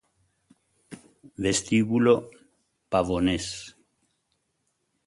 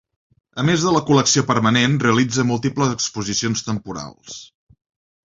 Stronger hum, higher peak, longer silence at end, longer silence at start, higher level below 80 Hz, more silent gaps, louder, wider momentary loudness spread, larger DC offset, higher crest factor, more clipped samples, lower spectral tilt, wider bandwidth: neither; second, -6 dBFS vs -2 dBFS; first, 1.35 s vs 0.8 s; first, 0.9 s vs 0.55 s; about the same, -52 dBFS vs -52 dBFS; neither; second, -25 LUFS vs -18 LUFS; about the same, 17 LU vs 17 LU; neither; about the same, 22 dB vs 18 dB; neither; about the same, -5 dB/octave vs -4.5 dB/octave; first, 11.5 kHz vs 7.8 kHz